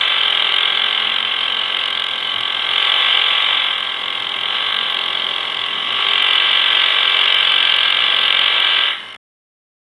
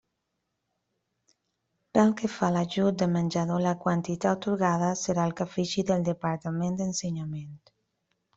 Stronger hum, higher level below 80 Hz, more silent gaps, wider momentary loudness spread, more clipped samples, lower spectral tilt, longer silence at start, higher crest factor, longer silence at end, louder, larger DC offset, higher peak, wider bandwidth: neither; about the same, -68 dBFS vs -64 dBFS; neither; about the same, 7 LU vs 6 LU; neither; second, 0 dB/octave vs -6 dB/octave; second, 0 s vs 1.95 s; second, 16 dB vs 22 dB; about the same, 0.8 s vs 0.8 s; first, -14 LUFS vs -28 LUFS; neither; first, 0 dBFS vs -8 dBFS; first, 12 kHz vs 8 kHz